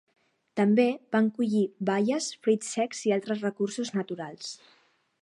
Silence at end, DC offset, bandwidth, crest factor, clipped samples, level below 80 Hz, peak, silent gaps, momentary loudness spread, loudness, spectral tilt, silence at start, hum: 0.65 s; under 0.1%; 11.5 kHz; 18 dB; under 0.1%; -80 dBFS; -10 dBFS; none; 12 LU; -28 LUFS; -5 dB/octave; 0.55 s; none